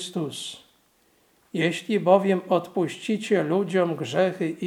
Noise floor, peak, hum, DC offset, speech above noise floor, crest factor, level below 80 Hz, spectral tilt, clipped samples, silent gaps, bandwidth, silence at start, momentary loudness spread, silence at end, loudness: -63 dBFS; -4 dBFS; none; under 0.1%; 39 dB; 20 dB; -78 dBFS; -5.5 dB/octave; under 0.1%; none; 15.5 kHz; 0 s; 13 LU; 0 s; -24 LUFS